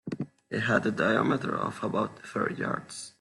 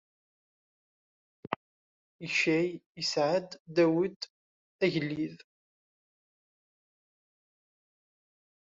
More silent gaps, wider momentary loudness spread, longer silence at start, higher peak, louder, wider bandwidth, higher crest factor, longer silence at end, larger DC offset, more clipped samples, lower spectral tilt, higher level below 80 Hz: second, none vs 1.56-2.19 s, 2.86-2.95 s, 3.60-3.65 s, 4.16-4.20 s, 4.30-4.79 s; second, 10 LU vs 13 LU; second, 0.05 s vs 1.5 s; about the same, -10 dBFS vs -8 dBFS; about the same, -29 LUFS vs -30 LUFS; first, 12 kHz vs 7.6 kHz; second, 20 dB vs 26 dB; second, 0.1 s vs 3.3 s; neither; neither; first, -5.5 dB/octave vs -4 dB/octave; first, -66 dBFS vs -76 dBFS